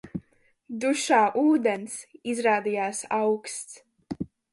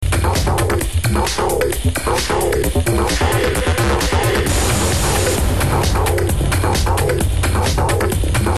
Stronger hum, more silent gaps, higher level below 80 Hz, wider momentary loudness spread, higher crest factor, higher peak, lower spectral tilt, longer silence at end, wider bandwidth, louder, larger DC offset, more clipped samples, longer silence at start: neither; neither; second, -62 dBFS vs -22 dBFS; first, 18 LU vs 2 LU; first, 18 dB vs 10 dB; second, -10 dBFS vs -4 dBFS; about the same, -4 dB/octave vs -4.5 dB/octave; first, 0.25 s vs 0 s; second, 11.5 kHz vs 13 kHz; second, -25 LUFS vs -17 LUFS; second, under 0.1% vs 2%; neither; about the same, 0.05 s vs 0 s